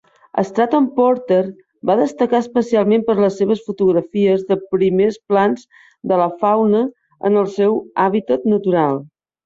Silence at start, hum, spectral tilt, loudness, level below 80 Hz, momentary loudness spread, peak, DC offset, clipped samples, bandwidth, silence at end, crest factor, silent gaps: 0.35 s; none; -7.5 dB/octave; -17 LUFS; -60 dBFS; 6 LU; -4 dBFS; under 0.1%; under 0.1%; 7.6 kHz; 0.4 s; 14 dB; none